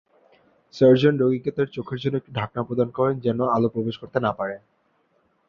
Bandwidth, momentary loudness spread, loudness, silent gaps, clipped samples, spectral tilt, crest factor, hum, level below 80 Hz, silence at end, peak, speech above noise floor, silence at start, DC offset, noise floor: 7 kHz; 12 LU; -23 LUFS; none; under 0.1%; -8.5 dB/octave; 18 dB; none; -60 dBFS; 0.9 s; -4 dBFS; 44 dB; 0.75 s; under 0.1%; -66 dBFS